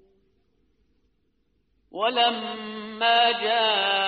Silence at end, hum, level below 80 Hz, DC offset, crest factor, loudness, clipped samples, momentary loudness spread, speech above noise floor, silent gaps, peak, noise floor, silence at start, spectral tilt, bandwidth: 0 s; none; -72 dBFS; under 0.1%; 18 dB; -22 LUFS; under 0.1%; 15 LU; 48 dB; none; -8 dBFS; -71 dBFS; 1.95 s; 1.5 dB/octave; 5.2 kHz